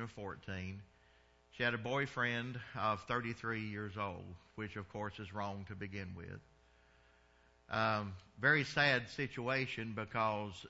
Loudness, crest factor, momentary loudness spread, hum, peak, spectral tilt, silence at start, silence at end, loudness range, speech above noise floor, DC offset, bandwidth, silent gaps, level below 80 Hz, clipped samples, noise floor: -38 LUFS; 22 dB; 16 LU; none; -18 dBFS; -3 dB/octave; 0 s; 0 s; 10 LU; 30 dB; under 0.1%; 7.6 kHz; none; -68 dBFS; under 0.1%; -69 dBFS